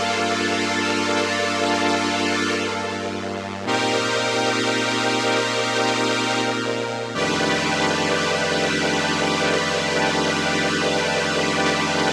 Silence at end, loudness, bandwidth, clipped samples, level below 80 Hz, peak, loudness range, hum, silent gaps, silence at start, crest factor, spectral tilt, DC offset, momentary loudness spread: 0 s; -21 LUFS; 15 kHz; under 0.1%; -56 dBFS; -4 dBFS; 2 LU; none; none; 0 s; 18 dB; -3 dB/octave; under 0.1%; 4 LU